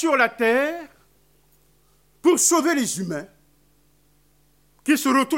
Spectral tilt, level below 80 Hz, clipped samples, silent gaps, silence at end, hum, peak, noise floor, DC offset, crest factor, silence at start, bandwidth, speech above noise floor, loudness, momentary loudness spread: -2.5 dB/octave; -66 dBFS; under 0.1%; none; 0 s; none; -4 dBFS; -61 dBFS; under 0.1%; 20 dB; 0 s; 16.5 kHz; 41 dB; -20 LUFS; 14 LU